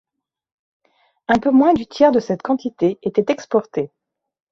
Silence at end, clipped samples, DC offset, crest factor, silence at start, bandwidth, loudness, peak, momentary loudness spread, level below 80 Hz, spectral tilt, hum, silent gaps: 0.65 s; under 0.1%; under 0.1%; 16 dB; 1.3 s; 7.4 kHz; -18 LUFS; -2 dBFS; 12 LU; -54 dBFS; -6.5 dB/octave; none; none